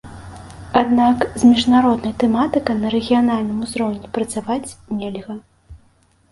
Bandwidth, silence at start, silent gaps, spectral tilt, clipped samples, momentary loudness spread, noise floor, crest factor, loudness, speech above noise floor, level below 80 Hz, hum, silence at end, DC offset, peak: 11.5 kHz; 0.05 s; none; -5.5 dB/octave; under 0.1%; 19 LU; -56 dBFS; 18 dB; -18 LUFS; 39 dB; -46 dBFS; none; 0.55 s; under 0.1%; 0 dBFS